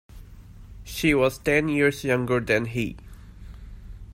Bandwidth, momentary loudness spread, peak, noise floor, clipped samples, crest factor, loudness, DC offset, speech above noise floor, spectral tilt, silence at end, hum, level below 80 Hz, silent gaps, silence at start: 16 kHz; 24 LU; -8 dBFS; -44 dBFS; under 0.1%; 18 dB; -23 LUFS; under 0.1%; 22 dB; -5.5 dB/octave; 0 s; none; -44 dBFS; none; 0.15 s